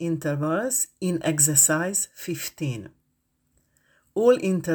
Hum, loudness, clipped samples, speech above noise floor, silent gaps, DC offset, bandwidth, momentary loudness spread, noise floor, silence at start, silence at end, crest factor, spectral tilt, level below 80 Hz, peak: none; -22 LUFS; under 0.1%; 48 dB; none; under 0.1%; over 20 kHz; 14 LU; -72 dBFS; 0 s; 0 s; 20 dB; -4 dB/octave; -64 dBFS; -4 dBFS